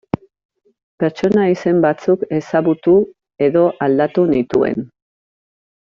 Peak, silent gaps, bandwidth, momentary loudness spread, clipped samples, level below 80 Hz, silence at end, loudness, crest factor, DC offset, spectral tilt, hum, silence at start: -2 dBFS; none; 7.2 kHz; 10 LU; under 0.1%; -54 dBFS; 1.05 s; -16 LUFS; 14 dB; under 0.1%; -8.5 dB/octave; none; 1 s